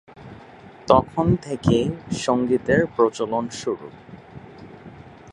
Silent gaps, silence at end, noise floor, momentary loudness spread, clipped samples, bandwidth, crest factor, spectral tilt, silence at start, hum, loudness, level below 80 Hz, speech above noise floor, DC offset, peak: none; 0 s; -44 dBFS; 24 LU; under 0.1%; 11.5 kHz; 22 dB; -6.5 dB/octave; 0.15 s; none; -21 LUFS; -46 dBFS; 23 dB; under 0.1%; 0 dBFS